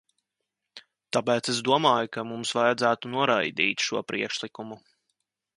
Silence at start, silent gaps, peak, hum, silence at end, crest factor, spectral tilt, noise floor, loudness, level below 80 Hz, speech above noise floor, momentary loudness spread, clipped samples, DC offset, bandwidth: 0.75 s; none; -6 dBFS; none; 0.8 s; 22 dB; -3.5 dB/octave; -84 dBFS; -25 LUFS; -72 dBFS; 58 dB; 10 LU; under 0.1%; under 0.1%; 11.5 kHz